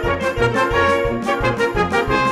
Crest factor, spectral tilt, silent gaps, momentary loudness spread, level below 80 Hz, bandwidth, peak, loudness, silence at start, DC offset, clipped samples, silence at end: 14 dB; -5.5 dB/octave; none; 3 LU; -32 dBFS; 14.5 kHz; -4 dBFS; -18 LUFS; 0 s; under 0.1%; under 0.1%; 0 s